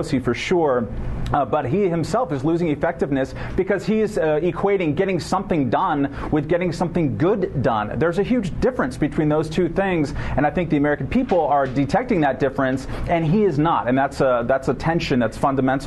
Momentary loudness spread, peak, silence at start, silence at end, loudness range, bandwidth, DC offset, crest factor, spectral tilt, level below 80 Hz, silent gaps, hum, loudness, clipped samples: 4 LU; -6 dBFS; 0 s; 0 s; 1 LU; 12 kHz; under 0.1%; 14 dB; -7 dB/octave; -36 dBFS; none; none; -21 LUFS; under 0.1%